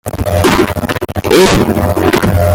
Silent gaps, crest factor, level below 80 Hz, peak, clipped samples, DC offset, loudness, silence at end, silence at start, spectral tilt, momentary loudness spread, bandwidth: none; 10 dB; -28 dBFS; 0 dBFS; under 0.1%; under 0.1%; -11 LUFS; 0 s; 0.05 s; -5.5 dB/octave; 9 LU; 17.5 kHz